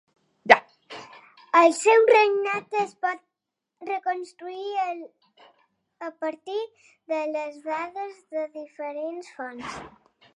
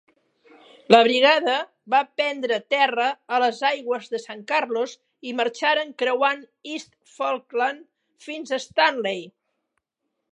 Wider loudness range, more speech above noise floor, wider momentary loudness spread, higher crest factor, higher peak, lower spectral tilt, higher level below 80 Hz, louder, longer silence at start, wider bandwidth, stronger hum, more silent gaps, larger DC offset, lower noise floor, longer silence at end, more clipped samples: first, 12 LU vs 6 LU; about the same, 59 dB vs 57 dB; first, 21 LU vs 17 LU; about the same, 26 dB vs 24 dB; about the same, 0 dBFS vs 0 dBFS; about the same, -2.5 dB/octave vs -3 dB/octave; first, -68 dBFS vs -78 dBFS; about the same, -24 LUFS vs -22 LUFS; second, 0.45 s vs 0.9 s; first, 11.5 kHz vs 10 kHz; neither; neither; neither; first, -84 dBFS vs -79 dBFS; second, 0.5 s vs 1 s; neither